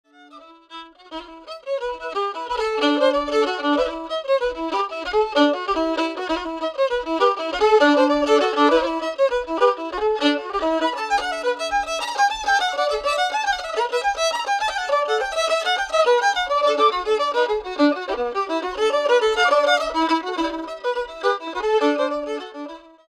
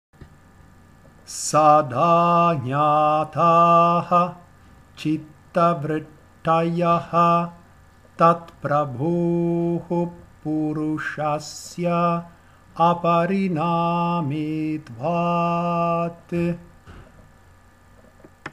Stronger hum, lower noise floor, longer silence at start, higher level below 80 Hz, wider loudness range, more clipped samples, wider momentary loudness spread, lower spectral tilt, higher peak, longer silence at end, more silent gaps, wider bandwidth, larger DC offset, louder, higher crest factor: neither; second, -46 dBFS vs -52 dBFS; first, 0.35 s vs 0.2 s; first, -50 dBFS vs -56 dBFS; second, 3 LU vs 7 LU; neither; about the same, 10 LU vs 12 LU; second, -2 dB/octave vs -6.5 dB/octave; about the same, -4 dBFS vs -2 dBFS; first, 0.3 s vs 0.05 s; neither; about the same, 14 kHz vs 13 kHz; neither; about the same, -21 LUFS vs -21 LUFS; about the same, 18 dB vs 20 dB